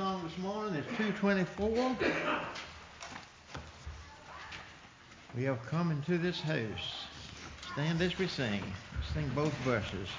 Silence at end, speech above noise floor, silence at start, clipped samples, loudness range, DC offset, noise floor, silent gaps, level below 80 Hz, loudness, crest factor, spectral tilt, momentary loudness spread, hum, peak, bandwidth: 0 s; 21 dB; 0 s; under 0.1%; 7 LU; under 0.1%; -55 dBFS; none; -52 dBFS; -35 LUFS; 16 dB; -6 dB/octave; 17 LU; none; -20 dBFS; 7.6 kHz